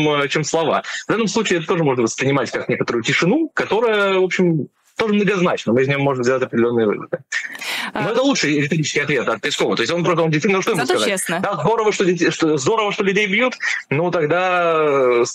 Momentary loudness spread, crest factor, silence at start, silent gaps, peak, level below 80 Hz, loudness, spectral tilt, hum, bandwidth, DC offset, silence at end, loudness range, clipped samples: 5 LU; 12 dB; 0 s; none; -6 dBFS; -60 dBFS; -18 LUFS; -4.5 dB/octave; none; 15 kHz; under 0.1%; 0 s; 2 LU; under 0.1%